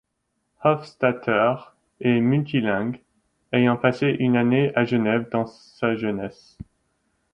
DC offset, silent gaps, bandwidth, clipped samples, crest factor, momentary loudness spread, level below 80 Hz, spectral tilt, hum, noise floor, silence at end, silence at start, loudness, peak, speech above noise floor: under 0.1%; none; 6.6 kHz; under 0.1%; 18 dB; 9 LU; -60 dBFS; -8.5 dB/octave; none; -75 dBFS; 1.05 s; 0.6 s; -22 LUFS; -6 dBFS; 53 dB